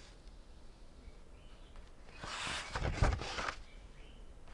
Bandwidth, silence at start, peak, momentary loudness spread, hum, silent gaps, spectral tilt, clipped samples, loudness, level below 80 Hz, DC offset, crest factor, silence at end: 11.5 kHz; 0 s; -18 dBFS; 24 LU; none; none; -4 dB/octave; under 0.1%; -39 LUFS; -46 dBFS; under 0.1%; 24 dB; 0 s